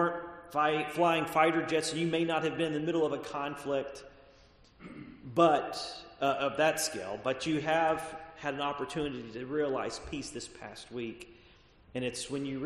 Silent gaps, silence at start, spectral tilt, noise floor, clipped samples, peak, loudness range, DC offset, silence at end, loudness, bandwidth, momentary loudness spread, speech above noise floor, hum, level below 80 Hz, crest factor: none; 0 s; -4.5 dB/octave; -60 dBFS; under 0.1%; -10 dBFS; 7 LU; under 0.1%; 0 s; -32 LUFS; 13 kHz; 16 LU; 28 dB; none; -62 dBFS; 22 dB